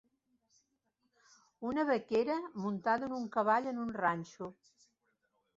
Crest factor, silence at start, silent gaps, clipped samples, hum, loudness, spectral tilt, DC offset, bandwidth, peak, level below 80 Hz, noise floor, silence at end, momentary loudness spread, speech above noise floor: 20 dB; 1.6 s; none; under 0.1%; none; -34 LUFS; -4.5 dB/octave; under 0.1%; 7.8 kHz; -18 dBFS; -76 dBFS; -81 dBFS; 1.05 s; 12 LU; 47 dB